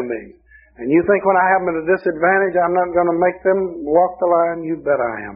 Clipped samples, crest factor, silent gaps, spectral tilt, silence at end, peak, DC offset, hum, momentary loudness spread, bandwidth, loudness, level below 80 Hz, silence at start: under 0.1%; 16 dB; none; -0.5 dB/octave; 0 s; -2 dBFS; under 0.1%; none; 6 LU; 3.1 kHz; -17 LUFS; -52 dBFS; 0 s